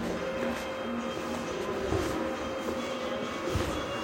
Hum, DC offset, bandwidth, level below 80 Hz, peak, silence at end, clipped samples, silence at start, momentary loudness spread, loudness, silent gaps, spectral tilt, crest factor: none; under 0.1%; 17 kHz; -48 dBFS; -16 dBFS; 0 s; under 0.1%; 0 s; 3 LU; -33 LUFS; none; -5 dB/octave; 18 dB